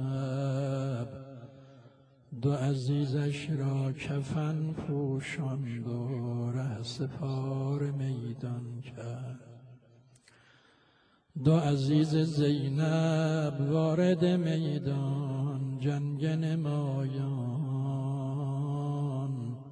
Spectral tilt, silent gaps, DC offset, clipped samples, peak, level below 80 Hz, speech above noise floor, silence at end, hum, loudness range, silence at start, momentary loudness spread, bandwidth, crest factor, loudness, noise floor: -8 dB/octave; none; under 0.1%; under 0.1%; -12 dBFS; -66 dBFS; 36 dB; 0 s; none; 8 LU; 0 s; 11 LU; 10 kHz; 18 dB; -32 LUFS; -66 dBFS